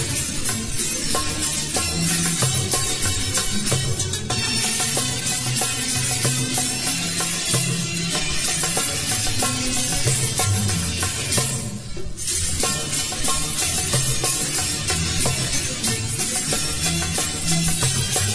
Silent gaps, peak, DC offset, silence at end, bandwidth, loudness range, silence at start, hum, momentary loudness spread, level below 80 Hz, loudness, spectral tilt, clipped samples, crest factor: none; -6 dBFS; 0.9%; 0 s; 11 kHz; 1 LU; 0 s; none; 3 LU; -38 dBFS; -20 LUFS; -2.5 dB/octave; under 0.1%; 16 dB